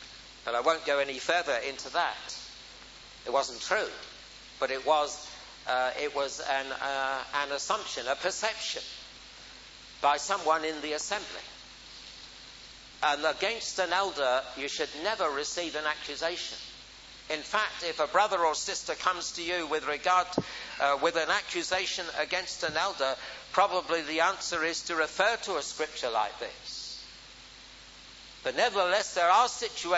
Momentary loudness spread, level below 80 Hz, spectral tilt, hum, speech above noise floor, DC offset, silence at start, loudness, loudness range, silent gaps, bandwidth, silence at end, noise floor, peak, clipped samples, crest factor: 19 LU; -62 dBFS; -1.5 dB/octave; none; 20 dB; under 0.1%; 0 s; -30 LUFS; 4 LU; none; 8 kHz; 0 s; -50 dBFS; -8 dBFS; under 0.1%; 22 dB